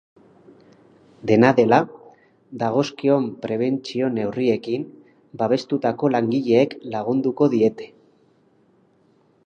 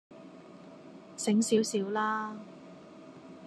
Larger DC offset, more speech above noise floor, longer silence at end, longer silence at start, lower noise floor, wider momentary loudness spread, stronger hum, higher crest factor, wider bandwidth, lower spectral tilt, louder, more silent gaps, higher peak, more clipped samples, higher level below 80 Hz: neither; first, 40 dB vs 21 dB; first, 1.6 s vs 0 s; first, 1.25 s vs 0.1 s; first, -59 dBFS vs -51 dBFS; second, 12 LU vs 24 LU; neither; about the same, 22 dB vs 20 dB; second, 7.4 kHz vs 13 kHz; first, -7 dB/octave vs -4.5 dB/octave; first, -21 LUFS vs -30 LUFS; neither; first, 0 dBFS vs -14 dBFS; neither; first, -66 dBFS vs -84 dBFS